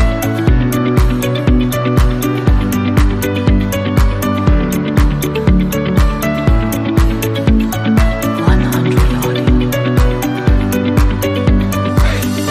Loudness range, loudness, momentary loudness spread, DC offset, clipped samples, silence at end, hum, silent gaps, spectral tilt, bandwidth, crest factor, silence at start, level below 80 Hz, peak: 0 LU; -14 LUFS; 2 LU; under 0.1%; under 0.1%; 0 s; none; none; -6.5 dB/octave; 15.5 kHz; 12 dB; 0 s; -16 dBFS; 0 dBFS